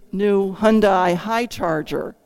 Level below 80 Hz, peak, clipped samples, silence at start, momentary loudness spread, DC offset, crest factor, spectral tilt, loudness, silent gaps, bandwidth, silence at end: -46 dBFS; -2 dBFS; under 0.1%; 0.15 s; 8 LU; under 0.1%; 16 dB; -6 dB/octave; -19 LUFS; none; 16 kHz; 0.15 s